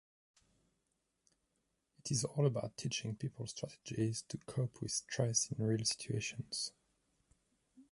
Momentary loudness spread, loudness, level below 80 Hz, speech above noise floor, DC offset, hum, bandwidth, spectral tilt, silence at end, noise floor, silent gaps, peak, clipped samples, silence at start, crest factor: 10 LU; -38 LUFS; -70 dBFS; 45 dB; under 0.1%; none; 11.5 kHz; -4 dB/octave; 0.1 s; -84 dBFS; none; -20 dBFS; under 0.1%; 2.05 s; 22 dB